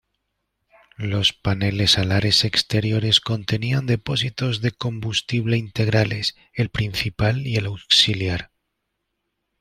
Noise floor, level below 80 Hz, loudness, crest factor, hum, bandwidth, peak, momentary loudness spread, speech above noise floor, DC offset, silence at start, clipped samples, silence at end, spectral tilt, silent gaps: -77 dBFS; -46 dBFS; -20 LUFS; 20 dB; none; 14.5 kHz; -2 dBFS; 9 LU; 56 dB; under 0.1%; 1 s; under 0.1%; 1.15 s; -4.5 dB/octave; none